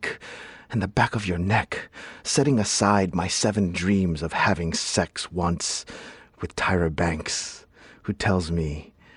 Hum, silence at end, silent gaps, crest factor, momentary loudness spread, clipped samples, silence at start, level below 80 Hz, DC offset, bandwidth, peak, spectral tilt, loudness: none; 0.35 s; none; 20 dB; 16 LU; under 0.1%; 0 s; -44 dBFS; under 0.1%; 11.5 kHz; -6 dBFS; -4.5 dB/octave; -24 LUFS